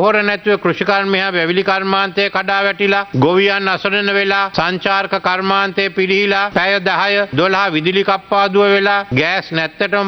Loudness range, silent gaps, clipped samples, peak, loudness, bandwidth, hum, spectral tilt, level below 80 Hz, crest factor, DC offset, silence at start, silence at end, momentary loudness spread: 1 LU; none; under 0.1%; 0 dBFS; -14 LUFS; 6.4 kHz; none; -6 dB/octave; -52 dBFS; 14 dB; under 0.1%; 0 s; 0 s; 4 LU